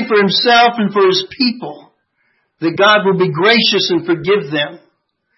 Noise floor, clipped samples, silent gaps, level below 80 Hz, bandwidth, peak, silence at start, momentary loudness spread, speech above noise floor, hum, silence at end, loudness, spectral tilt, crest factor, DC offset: -63 dBFS; under 0.1%; none; -60 dBFS; 6 kHz; 0 dBFS; 0 s; 10 LU; 51 dB; none; 0.6 s; -13 LUFS; -5 dB/octave; 14 dB; under 0.1%